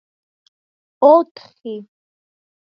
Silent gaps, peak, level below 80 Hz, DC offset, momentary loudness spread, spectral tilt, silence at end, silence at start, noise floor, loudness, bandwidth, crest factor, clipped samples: 1.31-1.35 s; 0 dBFS; -84 dBFS; under 0.1%; 21 LU; -7.5 dB/octave; 1 s; 1 s; under -90 dBFS; -13 LUFS; 5.6 kHz; 20 dB; under 0.1%